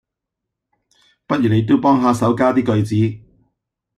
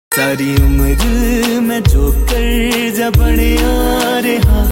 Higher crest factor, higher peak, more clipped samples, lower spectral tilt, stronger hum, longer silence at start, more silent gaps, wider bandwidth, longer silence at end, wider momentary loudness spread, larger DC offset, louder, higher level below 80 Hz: about the same, 14 dB vs 12 dB; second, -4 dBFS vs 0 dBFS; neither; first, -7.5 dB/octave vs -5.5 dB/octave; neither; first, 1.3 s vs 0.1 s; neither; second, 12.5 kHz vs 17 kHz; first, 0.8 s vs 0 s; first, 7 LU vs 2 LU; neither; second, -16 LUFS vs -13 LUFS; second, -54 dBFS vs -14 dBFS